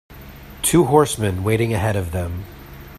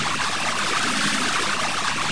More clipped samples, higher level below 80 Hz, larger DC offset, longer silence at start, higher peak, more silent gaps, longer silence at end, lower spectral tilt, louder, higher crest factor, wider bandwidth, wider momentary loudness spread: neither; first, -42 dBFS vs -54 dBFS; second, under 0.1% vs 3%; about the same, 0.1 s vs 0 s; first, 0 dBFS vs -10 dBFS; neither; about the same, 0 s vs 0 s; first, -5.5 dB/octave vs -1.5 dB/octave; about the same, -19 LUFS vs -21 LUFS; first, 20 dB vs 14 dB; first, 15.5 kHz vs 10.5 kHz; first, 24 LU vs 2 LU